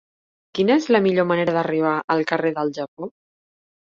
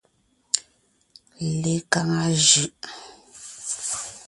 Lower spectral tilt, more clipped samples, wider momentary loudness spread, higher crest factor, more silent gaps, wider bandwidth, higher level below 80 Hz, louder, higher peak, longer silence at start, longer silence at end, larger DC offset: first, -6.5 dB/octave vs -2.5 dB/octave; neither; second, 15 LU vs 22 LU; second, 18 dB vs 24 dB; first, 2.04-2.08 s, 2.88-2.97 s vs none; second, 7.6 kHz vs 11.5 kHz; second, -66 dBFS vs -60 dBFS; about the same, -20 LUFS vs -22 LUFS; about the same, -2 dBFS vs -2 dBFS; about the same, 0.55 s vs 0.55 s; first, 0.85 s vs 0.05 s; neither